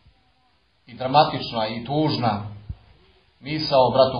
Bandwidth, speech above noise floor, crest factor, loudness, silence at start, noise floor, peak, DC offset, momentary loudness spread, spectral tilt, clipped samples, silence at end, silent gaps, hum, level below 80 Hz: 6.4 kHz; 43 dB; 20 dB; -22 LUFS; 0.9 s; -64 dBFS; -2 dBFS; under 0.1%; 22 LU; -8 dB/octave; under 0.1%; 0 s; none; none; -52 dBFS